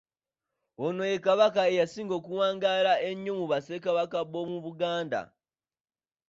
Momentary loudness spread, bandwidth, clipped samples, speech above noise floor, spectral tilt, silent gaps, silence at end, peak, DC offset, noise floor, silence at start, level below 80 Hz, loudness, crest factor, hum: 11 LU; 7.8 kHz; under 0.1%; over 62 dB; -5 dB/octave; none; 1.05 s; -10 dBFS; under 0.1%; under -90 dBFS; 0.8 s; -76 dBFS; -28 LUFS; 20 dB; none